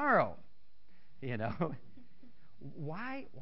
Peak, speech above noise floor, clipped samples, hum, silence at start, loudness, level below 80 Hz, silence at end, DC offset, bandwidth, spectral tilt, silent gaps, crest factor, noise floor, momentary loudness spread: -16 dBFS; 36 dB; under 0.1%; none; 0 s; -37 LUFS; -66 dBFS; 0 s; 0.7%; 5.6 kHz; -5.5 dB/octave; none; 22 dB; -71 dBFS; 22 LU